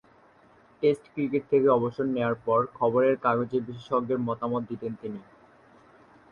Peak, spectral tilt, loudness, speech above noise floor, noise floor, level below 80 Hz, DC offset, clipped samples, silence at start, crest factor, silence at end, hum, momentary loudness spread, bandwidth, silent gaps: -10 dBFS; -8.5 dB/octave; -27 LUFS; 32 dB; -58 dBFS; -66 dBFS; under 0.1%; under 0.1%; 0.8 s; 18 dB; 1.1 s; none; 12 LU; 10.5 kHz; none